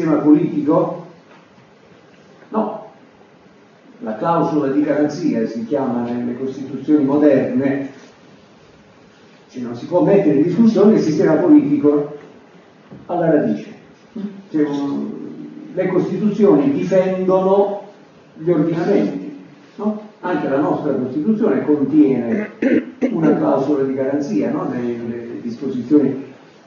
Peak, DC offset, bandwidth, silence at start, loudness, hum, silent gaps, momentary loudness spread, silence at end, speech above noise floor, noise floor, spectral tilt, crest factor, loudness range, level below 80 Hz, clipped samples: 0 dBFS; under 0.1%; 7 kHz; 0 s; -17 LUFS; none; none; 15 LU; 0.35 s; 32 dB; -47 dBFS; -8.5 dB/octave; 16 dB; 7 LU; -66 dBFS; under 0.1%